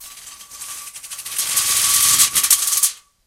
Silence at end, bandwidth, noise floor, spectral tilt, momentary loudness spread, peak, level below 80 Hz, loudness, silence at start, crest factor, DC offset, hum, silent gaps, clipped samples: 0.3 s; 17.5 kHz; -38 dBFS; 2.5 dB/octave; 21 LU; 0 dBFS; -56 dBFS; -14 LUFS; 0 s; 20 dB; under 0.1%; none; none; under 0.1%